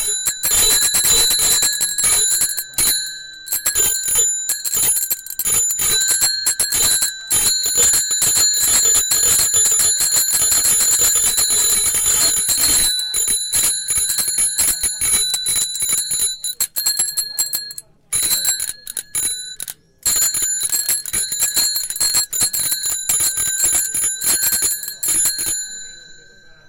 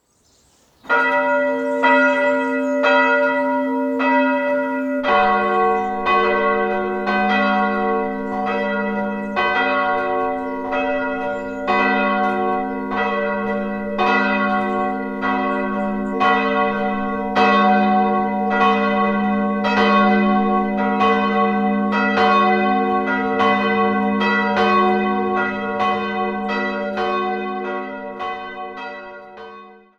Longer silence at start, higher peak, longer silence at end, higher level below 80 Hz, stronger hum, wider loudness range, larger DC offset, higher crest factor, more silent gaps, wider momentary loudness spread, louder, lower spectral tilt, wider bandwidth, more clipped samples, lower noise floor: second, 0 s vs 0.85 s; about the same, -2 dBFS vs -2 dBFS; first, 0.5 s vs 0.25 s; first, -44 dBFS vs -50 dBFS; neither; about the same, 6 LU vs 4 LU; neither; about the same, 16 dB vs 16 dB; neither; about the same, 8 LU vs 8 LU; first, -14 LUFS vs -18 LUFS; second, 1.5 dB/octave vs -6.5 dB/octave; first, 18 kHz vs 7.8 kHz; neither; second, -44 dBFS vs -58 dBFS